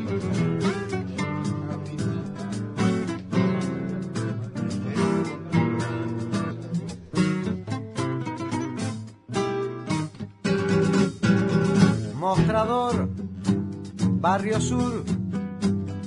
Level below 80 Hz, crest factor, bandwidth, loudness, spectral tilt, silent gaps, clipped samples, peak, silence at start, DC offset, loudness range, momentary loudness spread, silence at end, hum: -54 dBFS; 18 dB; 11 kHz; -26 LUFS; -6.5 dB/octave; none; under 0.1%; -6 dBFS; 0 s; under 0.1%; 6 LU; 9 LU; 0 s; none